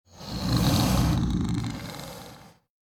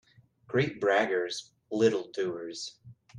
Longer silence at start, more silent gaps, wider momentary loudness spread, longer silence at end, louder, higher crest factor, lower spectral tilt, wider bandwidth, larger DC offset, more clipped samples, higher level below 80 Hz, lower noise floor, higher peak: second, 0.15 s vs 0.5 s; neither; first, 18 LU vs 12 LU; first, 0.5 s vs 0 s; first, -26 LUFS vs -30 LUFS; about the same, 16 dB vs 20 dB; about the same, -5.5 dB/octave vs -5 dB/octave; first, 19.5 kHz vs 10.5 kHz; neither; neither; first, -36 dBFS vs -72 dBFS; second, -49 dBFS vs -57 dBFS; about the same, -10 dBFS vs -12 dBFS